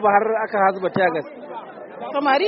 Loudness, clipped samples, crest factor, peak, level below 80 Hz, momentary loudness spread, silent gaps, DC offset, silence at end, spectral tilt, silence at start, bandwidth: -20 LUFS; under 0.1%; 18 dB; -2 dBFS; -68 dBFS; 16 LU; none; under 0.1%; 0 s; -3 dB/octave; 0 s; 5.8 kHz